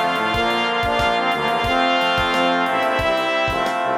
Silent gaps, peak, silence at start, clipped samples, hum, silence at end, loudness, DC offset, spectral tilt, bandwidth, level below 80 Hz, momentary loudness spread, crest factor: none; -4 dBFS; 0 s; under 0.1%; none; 0 s; -18 LUFS; under 0.1%; -4 dB/octave; over 20 kHz; -40 dBFS; 2 LU; 14 dB